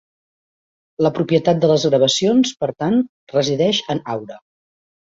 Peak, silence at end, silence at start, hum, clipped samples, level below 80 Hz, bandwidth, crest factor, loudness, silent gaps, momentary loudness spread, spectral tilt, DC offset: -2 dBFS; 0.7 s; 1 s; none; under 0.1%; -58 dBFS; 7.8 kHz; 18 dB; -17 LUFS; 3.09-3.27 s; 9 LU; -5 dB/octave; under 0.1%